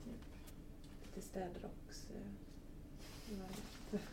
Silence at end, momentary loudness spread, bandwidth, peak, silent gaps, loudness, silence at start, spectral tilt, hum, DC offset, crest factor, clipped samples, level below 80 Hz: 0 s; 10 LU; 16.5 kHz; -32 dBFS; none; -52 LUFS; 0 s; -5.5 dB/octave; none; under 0.1%; 18 dB; under 0.1%; -56 dBFS